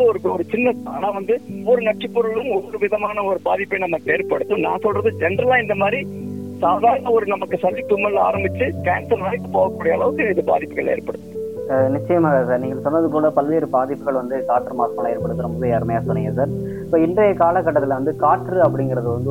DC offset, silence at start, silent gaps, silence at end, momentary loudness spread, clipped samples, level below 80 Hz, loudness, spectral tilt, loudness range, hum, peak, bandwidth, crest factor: 0.3%; 0 s; none; 0 s; 6 LU; under 0.1%; -52 dBFS; -19 LUFS; -8 dB/octave; 2 LU; none; -4 dBFS; 16.5 kHz; 16 dB